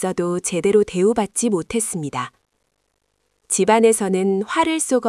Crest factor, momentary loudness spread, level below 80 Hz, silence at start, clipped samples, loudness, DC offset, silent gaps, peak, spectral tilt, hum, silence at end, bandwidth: 18 dB; 9 LU; -56 dBFS; 0 s; under 0.1%; -19 LUFS; under 0.1%; none; -2 dBFS; -4.5 dB/octave; none; 0 s; 12 kHz